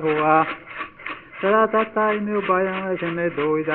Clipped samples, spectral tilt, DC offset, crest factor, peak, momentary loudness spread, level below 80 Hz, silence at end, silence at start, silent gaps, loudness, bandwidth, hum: under 0.1%; -4.5 dB/octave; under 0.1%; 18 dB; -4 dBFS; 14 LU; -60 dBFS; 0 s; 0 s; none; -21 LUFS; 4.3 kHz; none